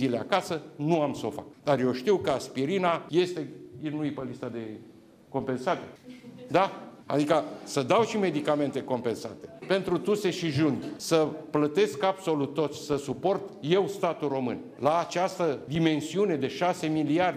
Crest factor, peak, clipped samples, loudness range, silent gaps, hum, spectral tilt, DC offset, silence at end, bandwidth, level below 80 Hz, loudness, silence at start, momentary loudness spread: 16 dB; -12 dBFS; under 0.1%; 4 LU; none; none; -5.5 dB/octave; under 0.1%; 0 s; 15.5 kHz; -66 dBFS; -28 LUFS; 0 s; 11 LU